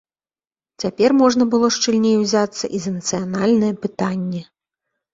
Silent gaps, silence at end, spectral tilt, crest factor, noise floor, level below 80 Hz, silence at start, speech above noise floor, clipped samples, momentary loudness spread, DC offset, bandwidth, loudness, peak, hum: none; 0.7 s; -4.5 dB/octave; 16 dB; under -90 dBFS; -58 dBFS; 0.8 s; over 72 dB; under 0.1%; 11 LU; under 0.1%; 7.8 kHz; -18 LUFS; -2 dBFS; none